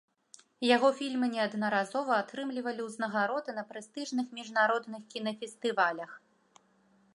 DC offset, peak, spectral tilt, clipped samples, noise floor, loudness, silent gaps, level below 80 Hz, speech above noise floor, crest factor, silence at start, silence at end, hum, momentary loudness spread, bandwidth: under 0.1%; -10 dBFS; -4 dB/octave; under 0.1%; -67 dBFS; -31 LUFS; none; -86 dBFS; 36 dB; 22 dB; 0.6 s; 0.95 s; none; 12 LU; 11.5 kHz